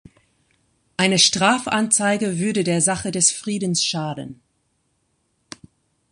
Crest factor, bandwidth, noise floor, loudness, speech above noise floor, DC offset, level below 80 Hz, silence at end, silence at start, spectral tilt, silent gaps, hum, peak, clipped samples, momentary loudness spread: 20 dB; 11.5 kHz; -69 dBFS; -18 LUFS; 49 dB; under 0.1%; -58 dBFS; 1.8 s; 1 s; -2.5 dB/octave; none; none; -2 dBFS; under 0.1%; 13 LU